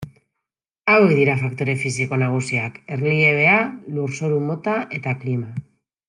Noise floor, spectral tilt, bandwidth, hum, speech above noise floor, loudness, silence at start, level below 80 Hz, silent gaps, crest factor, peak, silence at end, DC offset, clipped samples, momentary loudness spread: -83 dBFS; -6.5 dB/octave; 11 kHz; none; 63 dB; -19 LUFS; 0 s; -62 dBFS; none; 18 dB; -2 dBFS; 0.45 s; under 0.1%; under 0.1%; 12 LU